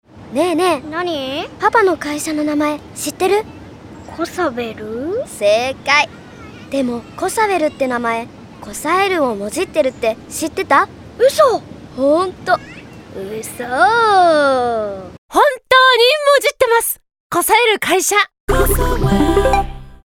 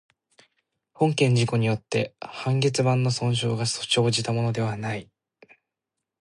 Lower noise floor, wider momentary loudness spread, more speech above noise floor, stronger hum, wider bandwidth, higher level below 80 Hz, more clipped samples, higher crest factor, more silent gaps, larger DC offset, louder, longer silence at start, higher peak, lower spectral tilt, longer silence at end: second, -35 dBFS vs -85 dBFS; first, 15 LU vs 9 LU; second, 20 dB vs 62 dB; neither; first, 19 kHz vs 11.5 kHz; first, -32 dBFS vs -60 dBFS; neither; about the same, 16 dB vs 16 dB; first, 15.18-15.29 s, 17.20-17.30 s, 18.40-18.48 s vs none; neither; first, -15 LUFS vs -24 LUFS; second, 0.15 s vs 1 s; first, 0 dBFS vs -8 dBFS; second, -3.5 dB/octave vs -5 dB/octave; second, 0.1 s vs 1.2 s